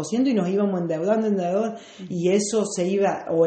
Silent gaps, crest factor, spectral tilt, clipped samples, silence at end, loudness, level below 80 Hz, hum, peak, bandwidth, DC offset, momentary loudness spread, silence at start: none; 14 dB; -6 dB/octave; under 0.1%; 0 s; -23 LUFS; -68 dBFS; none; -8 dBFS; 8.8 kHz; under 0.1%; 4 LU; 0 s